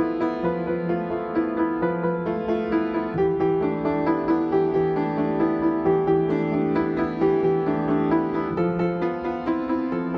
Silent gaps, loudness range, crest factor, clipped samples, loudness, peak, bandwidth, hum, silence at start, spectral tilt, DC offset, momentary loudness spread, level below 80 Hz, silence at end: none; 2 LU; 14 dB; under 0.1%; -23 LUFS; -10 dBFS; 5.6 kHz; none; 0 s; -10 dB/octave; under 0.1%; 4 LU; -50 dBFS; 0 s